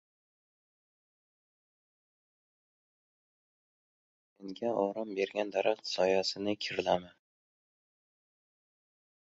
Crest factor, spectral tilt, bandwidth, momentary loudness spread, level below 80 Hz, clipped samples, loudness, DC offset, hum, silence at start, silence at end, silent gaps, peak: 24 dB; -2.5 dB/octave; 7.6 kHz; 6 LU; -74 dBFS; under 0.1%; -33 LUFS; under 0.1%; none; 4.4 s; 2.2 s; none; -14 dBFS